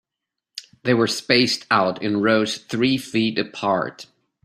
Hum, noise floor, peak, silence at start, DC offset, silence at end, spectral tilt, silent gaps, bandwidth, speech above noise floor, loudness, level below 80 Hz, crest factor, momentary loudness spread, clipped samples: none; -84 dBFS; -2 dBFS; 0.55 s; under 0.1%; 0.4 s; -4.5 dB/octave; none; 15.5 kHz; 64 dB; -20 LUFS; -60 dBFS; 20 dB; 12 LU; under 0.1%